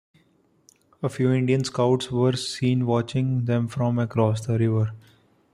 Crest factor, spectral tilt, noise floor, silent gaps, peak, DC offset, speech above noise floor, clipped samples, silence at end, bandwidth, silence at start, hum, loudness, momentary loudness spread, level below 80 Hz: 16 dB; -7 dB/octave; -63 dBFS; none; -8 dBFS; under 0.1%; 40 dB; under 0.1%; 0.55 s; 11.5 kHz; 1 s; none; -24 LUFS; 3 LU; -60 dBFS